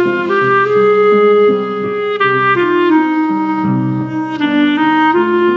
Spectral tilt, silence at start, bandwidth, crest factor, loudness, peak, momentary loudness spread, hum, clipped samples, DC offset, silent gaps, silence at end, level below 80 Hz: -4.5 dB/octave; 0 s; 6.2 kHz; 10 dB; -12 LUFS; -2 dBFS; 8 LU; none; under 0.1%; under 0.1%; none; 0 s; -60 dBFS